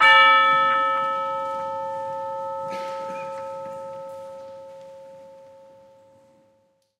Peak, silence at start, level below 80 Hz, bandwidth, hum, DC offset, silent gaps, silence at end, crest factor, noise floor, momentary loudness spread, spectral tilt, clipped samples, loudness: -2 dBFS; 0 s; -72 dBFS; 11.5 kHz; none; under 0.1%; none; 1.55 s; 22 dB; -65 dBFS; 25 LU; -2 dB/octave; under 0.1%; -21 LUFS